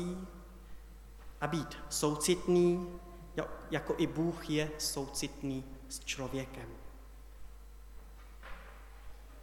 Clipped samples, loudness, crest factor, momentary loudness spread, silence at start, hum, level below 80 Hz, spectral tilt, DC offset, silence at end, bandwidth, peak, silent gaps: under 0.1%; -35 LUFS; 20 dB; 24 LU; 0 s; none; -52 dBFS; -4.5 dB/octave; under 0.1%; 0 s; 18 kHz; -16 dBFS; none